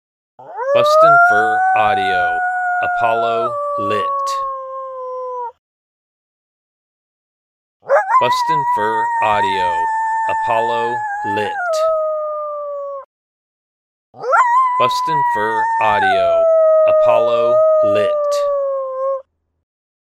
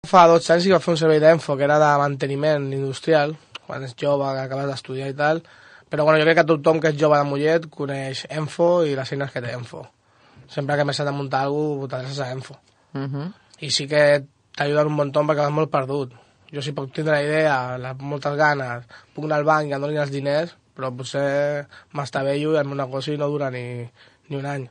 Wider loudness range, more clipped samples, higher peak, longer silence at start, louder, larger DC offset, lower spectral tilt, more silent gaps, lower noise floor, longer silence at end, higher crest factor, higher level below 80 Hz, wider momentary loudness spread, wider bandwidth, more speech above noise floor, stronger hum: first, 9 LU vs 6 LU; neither; about the same, 0 dBFS vs -2 dBFS; first, 0.4 s vs 0.05 s; first, -15 LUFS vs -21 LUFS; neither; second, -4 dB/octave vs -5.5 dB/octave; first, 5.59-7.80 s, 13.05-14.13 s vs none; first, under -90 dBFS vs -52 dBFS; first, 0.9 s vs 0.05 s; about the same, 16 dB vs 20 dB; first, -56 dBFS vs -66 dBFS; second, 13 LU vs 16 LU; first, 13.5 kHz vs 10 kHz; first, over 75 dB vs 31 dB; neither